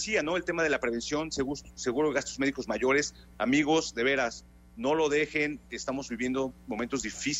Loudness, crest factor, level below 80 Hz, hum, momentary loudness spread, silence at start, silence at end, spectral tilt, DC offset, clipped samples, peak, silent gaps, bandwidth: -29 LUFS; 16 dB; -54 dBFS; none; 8 LU; 0 s; 0 s; -3.5 dB/octave; under 0.1%; under 0.1%; -12 dBFS; none; 12.5 kHz